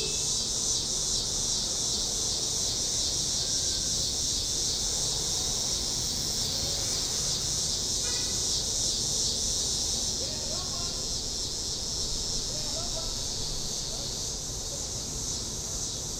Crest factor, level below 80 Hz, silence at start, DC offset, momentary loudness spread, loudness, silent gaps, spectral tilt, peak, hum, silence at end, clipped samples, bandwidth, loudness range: 16 dB; -44 dBFS; 0 s; under 0.1%; 5 LU; -27 LUFS; none; -1 dB/octave; -14 dBFS; none; 0 s; under 0.1%; 16 kHz; 4 LU